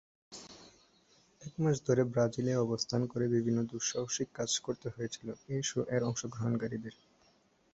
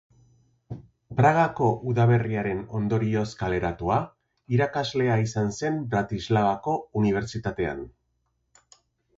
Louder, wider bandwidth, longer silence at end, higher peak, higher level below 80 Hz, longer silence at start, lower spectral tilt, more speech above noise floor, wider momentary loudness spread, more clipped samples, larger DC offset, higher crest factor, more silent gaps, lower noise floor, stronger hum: second, -34 LUFS vs -25 LUFS; about the same, 8.2 kHz vs 7.8 kHz; second, 0.8 s vs 1.3 s; second, -16 dBFS vs -6 dBFS; second, -68 dBFS vs -50 dBFS; second, 0.3 s vs 0.7 s; second, -5 dB/octave vs -7 dB/octave; second, 36 dB vs 49 dB; first, 19 LU vs 11 LU; neither; neither; about the same, 20 dB vs 20 dB; neither; second, -69 dBFS vs -74 dBFS; neither